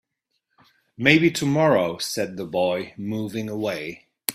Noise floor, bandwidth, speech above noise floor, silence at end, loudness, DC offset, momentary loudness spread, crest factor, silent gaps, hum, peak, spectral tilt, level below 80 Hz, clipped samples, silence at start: -77 dBFS; 15.5 kHz; 54 dB; 0 s; -22 LUFS; under 0.1%; 12 LU; 22 dB; none; none; -2 dBFS; -5 dB/octave; -60 dBFS; under 0.1%; 1 s